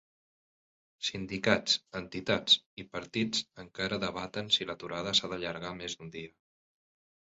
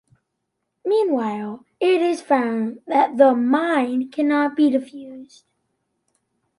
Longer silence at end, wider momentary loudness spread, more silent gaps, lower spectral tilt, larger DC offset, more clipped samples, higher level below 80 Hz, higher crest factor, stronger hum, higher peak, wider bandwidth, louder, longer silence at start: second, 0.95 s vs 1.35 s; about the same, 16 LU vs 15 LU; first, 2.66-2.77 s vs none; second, -1.5 dB/octave vs -5.5 dB/octave; neither; neither; first, -64 dBFS vs -74 dBFS; first, 24 dB vs 18 dB; neither; second, -12 dBFS vs -2 dBFS; second, 8 kHz vs 11.5 kHz; second, -31 LUFS vs -20 LUFS; first, 1 s vs 0.85 s